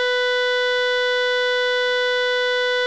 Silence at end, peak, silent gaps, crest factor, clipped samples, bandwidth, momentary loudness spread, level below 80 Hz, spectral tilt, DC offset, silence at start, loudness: 0 s; -12 dBFS; none; 8 dB; under 0.1%; 8.4 kHz; 0 LU; -64 dBFS; 2 dB/octave; 0.3%; 0 s; -19 LUFS